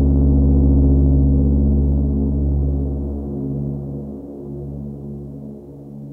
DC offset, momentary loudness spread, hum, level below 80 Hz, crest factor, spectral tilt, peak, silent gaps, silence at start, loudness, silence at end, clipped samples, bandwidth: under 0.1%; 18 LU; none; -20 dBFS; 10 dB; -14.5 dB/octave; -6 dBFS; none; 0 s; -18 LUFS; 0 s; under 0.1%; 1.3 kHz